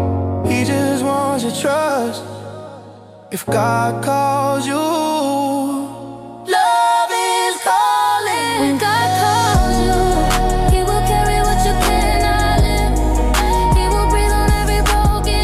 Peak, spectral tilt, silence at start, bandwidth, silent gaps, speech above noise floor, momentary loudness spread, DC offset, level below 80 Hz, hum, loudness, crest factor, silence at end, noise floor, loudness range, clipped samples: -4 dBFS; -4.5 dB/octave; 0 s; 15.5 kHz; none; 21 dB; 7 LU; under 0.1%; -22 dBFS; none; -16 LUFS; 12 dB; 0 s; -39 dBFS; 4 LU; under 0.1%